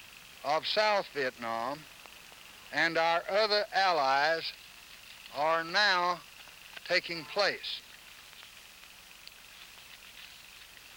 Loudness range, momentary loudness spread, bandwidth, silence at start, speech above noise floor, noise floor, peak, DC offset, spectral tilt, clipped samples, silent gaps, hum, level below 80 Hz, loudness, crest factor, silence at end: 9 LU; 22 LU; over 20 kHz; 0 s; 23 dB; -53 dBFS; -14 dBFS; under 0.1%; -2 dB/octave; under 0.1%; none; none; -70 dBFS; -30 LUFS; 20 dB; 0 s